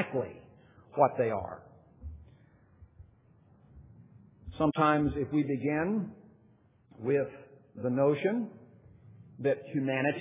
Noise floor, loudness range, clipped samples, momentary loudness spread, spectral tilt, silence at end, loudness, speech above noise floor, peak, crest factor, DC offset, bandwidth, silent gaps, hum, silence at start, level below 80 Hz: -63 dBFS; 5 LU; under 0.1%; 22 LU; -6.5 dB/octave; 0 s; -31 LUFS; 34 dB; -10 dBFS; 22 dB; under 0.1%; 3.8 kHz; none; none; 0 s; -56 dBFS